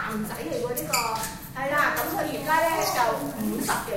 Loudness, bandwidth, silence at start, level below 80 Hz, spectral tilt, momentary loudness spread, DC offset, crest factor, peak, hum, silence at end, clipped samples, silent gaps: -26 LUFS; 17 kHz; 0 s; -50 dBFS; -3 dB/octave; 8 LU; under 0.1%; 18 dB; -8 dBFS; none; 0 s; under 0.1%; none